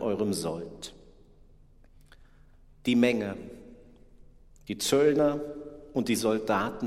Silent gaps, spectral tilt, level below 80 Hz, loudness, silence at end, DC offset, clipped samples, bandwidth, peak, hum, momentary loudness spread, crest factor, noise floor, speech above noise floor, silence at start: none; -4.5 dB/octave; -56 dBFS; -28 LUFS; 0 s; under 0.1%; under 0.1%; 16 kHz; -10 dBFS; none; 19 LU; 20 dB; -55 dBFS; 28 dB; 0 s